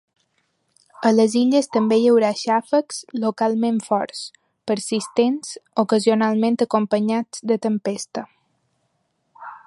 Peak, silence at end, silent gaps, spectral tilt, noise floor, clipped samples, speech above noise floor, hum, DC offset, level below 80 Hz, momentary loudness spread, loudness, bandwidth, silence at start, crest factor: -4 dBFS; 0.1 s; none; -5 dB/octave; -70 dBFS; under 0.1%; 51 dB; none; under 0.1%; -72 dBFS; 13 LU; -20 LUFS; 11.5 kHz; 1 s; 18 dB